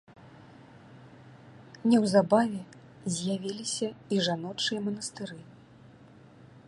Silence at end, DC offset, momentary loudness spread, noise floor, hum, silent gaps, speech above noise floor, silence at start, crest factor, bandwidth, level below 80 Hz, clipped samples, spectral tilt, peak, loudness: 0.1 s; under 0.1%; 18 LU; -54 dBFS; none; none; 26 dB; 0.2 s; 22 dB; 11.5 kHz; -72 dBFS; under 0.1%; -4.5 dB/octave; -8 dBFS; -29 LUFS